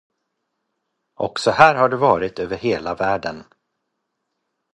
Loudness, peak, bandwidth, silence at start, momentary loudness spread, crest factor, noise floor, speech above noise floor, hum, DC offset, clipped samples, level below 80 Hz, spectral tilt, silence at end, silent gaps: -18 LUFS; 0 dBFS; 11 kHz; 1.2 s; 14 LU; 22 dB; -76 dBFS; 58 dB; none; under 0.1%; under 0.1%; -54 dBFS; -5 dB/octave; 1.35 s; none